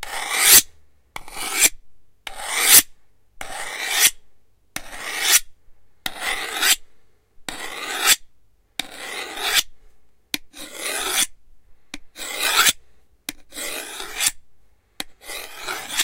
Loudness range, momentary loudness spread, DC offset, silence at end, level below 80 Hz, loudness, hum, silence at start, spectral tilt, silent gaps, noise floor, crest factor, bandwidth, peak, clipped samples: 7 LU; 24 LU; under 0.1%; 0 s; -50 dBFS; -18 LUFS; none; 0 s; 2 dB/octave; none; -54 dBFS; 24 dB; 16 kHz; 0 dBFS; under 0.1%